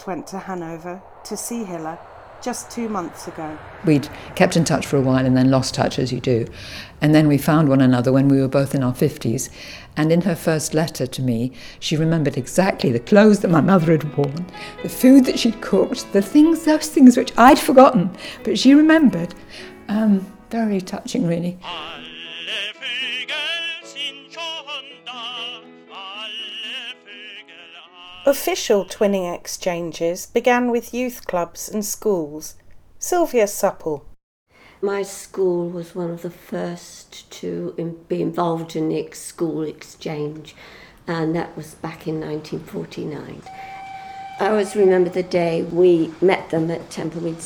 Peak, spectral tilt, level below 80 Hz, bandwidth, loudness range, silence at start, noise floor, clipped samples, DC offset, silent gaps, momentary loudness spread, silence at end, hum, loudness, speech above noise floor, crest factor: 0 dBFS; -5.5 dB/octave; -50 dBFS; 19.5 kHz; 13 LU; 0 s; -43 dBFS; under 0.1%; under 0.1%; 34.23-34.46 s; 19 LU; 0 s; none; -19 LUFS; 24 dB; 20 dB